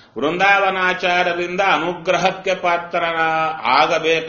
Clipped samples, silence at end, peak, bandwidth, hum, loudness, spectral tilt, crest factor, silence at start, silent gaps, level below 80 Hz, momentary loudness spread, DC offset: under 0.1%; 0 s; 0 dBFS; 7 kHz; none; -17 LUFS; -1 dB/octave; 18 dB; 0.15 s; none; -56 dBFS; 5 LU; under 0.1%